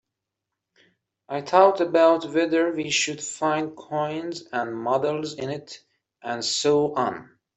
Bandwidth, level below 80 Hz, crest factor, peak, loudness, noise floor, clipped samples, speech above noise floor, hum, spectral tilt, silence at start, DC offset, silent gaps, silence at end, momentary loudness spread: 8.4 kHz; -70 dBFS; 22 dB; -4 dBFS; -23 LUFS; -84 dBFS; under 0.1%; 61 dB; none; -3.5 dB/octave; 1.3 s; under 0.1%; none; 0.35 s; 14 LU